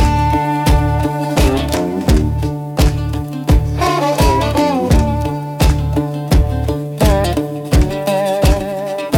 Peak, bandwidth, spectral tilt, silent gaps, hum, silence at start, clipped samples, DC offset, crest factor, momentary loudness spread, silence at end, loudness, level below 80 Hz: -2 dBFS; 18 kHz; -6 dB/octave; none; none; 0 s; under 0.1%; under 0.1%; 12 dB; 7 LU; 0 s; -15 LUFS; -18 dBFS